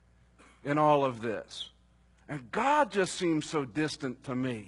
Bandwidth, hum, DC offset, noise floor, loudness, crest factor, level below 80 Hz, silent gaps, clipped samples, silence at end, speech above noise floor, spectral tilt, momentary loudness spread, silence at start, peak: 11 kHz; none; under 0.1%; -63 dBFS; -30 LUFS; 18 dB; -64 dBFS; none; under 0.1%; 0 s; 33 dB; -5 dB/octave; 16 LU; 0.65 s; -12 dBFS